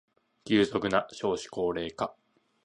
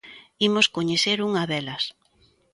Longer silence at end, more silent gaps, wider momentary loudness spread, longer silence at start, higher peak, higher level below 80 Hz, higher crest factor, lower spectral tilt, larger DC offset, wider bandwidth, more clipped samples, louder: about the same, 0.5 s vs 0.6 s; neither; about the same, 9 LU vs 10 LU; first, 0.45 s vs 0.05 s; second, -10 dBFS vs -4 dBFS; first, -60 dBFS vs -66 dBFS; about the same, 20 dB vs 20 dB; first, -5 dB/octave vs -3.5 dB/octave; neither; about the same, 11 kHz vs 11.5 kHz; neither; second, -30 LUFS vs -23 LUFS